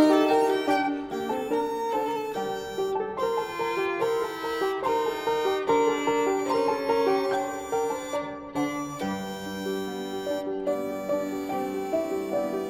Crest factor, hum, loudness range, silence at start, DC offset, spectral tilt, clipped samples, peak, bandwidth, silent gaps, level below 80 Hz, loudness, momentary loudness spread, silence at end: 18 dB; none; 5 LU; 0 s; under 0.1%; -4.5 dB/octave; under 0.1%; -10 dBFS; 18.5 kHz; none; -60 dBFS; -27 LUFS; 8 LU; 0 s